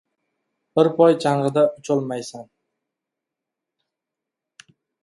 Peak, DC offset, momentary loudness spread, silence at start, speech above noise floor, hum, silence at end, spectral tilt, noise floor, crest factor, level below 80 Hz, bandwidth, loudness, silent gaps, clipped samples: -2 dBFS; under 0.1%; 16 LU; 0.75 s; 66 dB; none; 2.6 s; -6.5 dB/octave; -85 dBFS; 22 dB; -72 dBFS; 11.5 kHz; -20 LUFS; none; under 0.1%